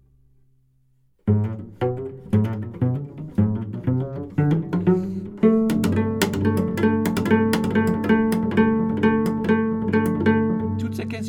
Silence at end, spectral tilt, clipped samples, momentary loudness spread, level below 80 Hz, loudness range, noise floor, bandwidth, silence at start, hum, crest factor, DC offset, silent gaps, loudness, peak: 0 s; -7.5 dB/octave; under 0.1%; 7 LU; -50 dBFS; 5 LU; -61 dBFS; 18 kHz; 1.25 s; none; 18 dB; under 0.1%; none; -22 LUFS; -4 dBFS